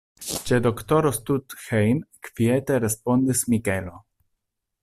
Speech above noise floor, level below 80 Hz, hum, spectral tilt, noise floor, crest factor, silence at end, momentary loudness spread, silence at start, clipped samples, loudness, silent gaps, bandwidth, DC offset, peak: 56 dB; -52 dBFS; none; -5.5 dB/octave; -78 dBFS; 16 dB; 0.85 s; 9 LU; 0.2 s; under 0.1%; -23 LUFS; none; 15.5 kHz; under 0.1%; -8 dBFS